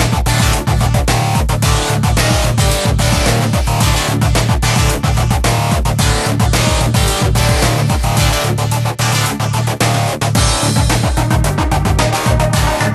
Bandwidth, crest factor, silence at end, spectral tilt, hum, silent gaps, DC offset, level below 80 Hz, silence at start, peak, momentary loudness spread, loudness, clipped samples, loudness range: 13.5 kHz; 12 dB; 0 s; -4.5 dB/octave; none; none; under 0.1%; -20 dBFS; 0 s; 0 dBFS; 2 LU; -13 LUFS; under 0.1%; 1 LU